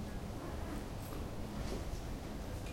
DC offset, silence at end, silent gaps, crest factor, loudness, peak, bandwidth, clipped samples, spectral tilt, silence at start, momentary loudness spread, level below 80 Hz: under 0.1%; 0 s; none; 12 dB; -44 LUFS; -30 dBFS; 16.5 kHz; under 0.1%; -6 dB/octave; 0 s; 2 LU; -46 dBFS